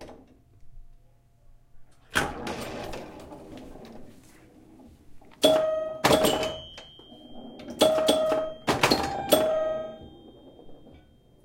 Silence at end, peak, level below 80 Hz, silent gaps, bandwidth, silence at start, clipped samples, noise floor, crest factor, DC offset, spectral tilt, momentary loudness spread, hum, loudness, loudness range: 0.55 s; -4 dBFS; -52 dBFS; none; 16.5 kHz; 0 s; under 0.1%; -57 dBFS; 24 dB; under 0.1%; -3.5 dB/octave; 24 LU; none; -25 LUFS; 10 LU